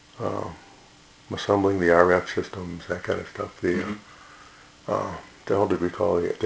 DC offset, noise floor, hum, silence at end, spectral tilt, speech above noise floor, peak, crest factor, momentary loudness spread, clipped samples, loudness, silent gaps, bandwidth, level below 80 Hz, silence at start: under 0.1%; -52 dBFS; none; 0 s; -6 dB/octave; 28 dB; 0 dBFS; 24 dB; 16 LU; under 0.1%; -25 LUFS; none; 8 kHz; -50 dBFS; 0.15 s